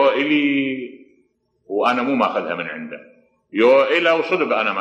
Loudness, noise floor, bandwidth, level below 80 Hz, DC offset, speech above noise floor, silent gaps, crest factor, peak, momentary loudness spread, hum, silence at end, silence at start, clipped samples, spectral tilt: -18 LUFS; -63 dBFS; 8 kHz; -72 dBFS; under 0.1%; 45 dB; none; 14 dB; -4 dBFS; 16 LU; none; 0 s; 0 s; under 0.1%; -5.5 dB/octave